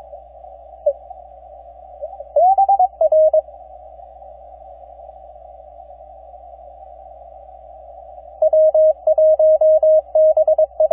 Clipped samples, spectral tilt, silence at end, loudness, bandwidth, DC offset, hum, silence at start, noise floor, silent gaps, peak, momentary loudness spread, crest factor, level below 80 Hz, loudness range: under 0.1%; -9.5 dB/octave; 0.05 s; -15 LUFS; 1.2 kHz; under 0.1%; none; 0.15 s; -40 dBFS; none; -8 dBFS; 20 LU; 10 dB; -50 dBFS; 7 LU